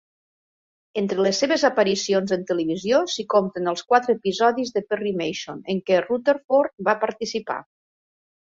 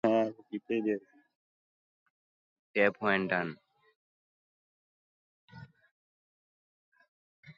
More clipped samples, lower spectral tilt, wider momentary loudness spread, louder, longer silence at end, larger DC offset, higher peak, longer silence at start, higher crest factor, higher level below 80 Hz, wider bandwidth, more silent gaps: neither; second, -4.5 dB/octave vs -7.5 dB/octave; second, 9 LU vs 12 LU; first, -22 LUFS vs -31 LUFS; first, 0.9 s vs 0.05 s; neither; first, -4 dBFS vs -12 dBFS; first, 0.95 s vs 0.05 s; about the same, 20 dB vs 24 dB; first, -66 dBFS vs -76 dBFS; about the same, 7.8 kHz vs 7.2 kHz; second, 6.44-6.49 s, 6.73-6.78 s vs 1.35-2.74 s, 3.95-5.48 s, 5.91-6.92 s, 7.08-7.43 s